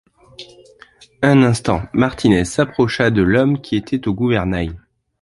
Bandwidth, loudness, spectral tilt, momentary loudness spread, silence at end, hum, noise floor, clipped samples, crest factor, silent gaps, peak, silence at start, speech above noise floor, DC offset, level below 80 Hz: 11.5 kHz; -17 LUFS; -6.5 dB/octave; 8 LU; 0.45 s; none; -47 dBFS; under 0.1%; 16 dB; none; -2 dBFS; 0.4 s; 31 dB; under 0.1%; -38 dBFS